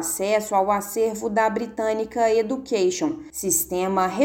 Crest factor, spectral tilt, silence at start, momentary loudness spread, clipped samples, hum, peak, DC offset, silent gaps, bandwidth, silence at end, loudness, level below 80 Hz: 16 dB; -3.5 dB/octave; 0 s; 4 LU; under 0.1%; none; -8 dBFS; under 0.1%; none; 17 kHz; 0 s; -23 LUFS; -56 dBFS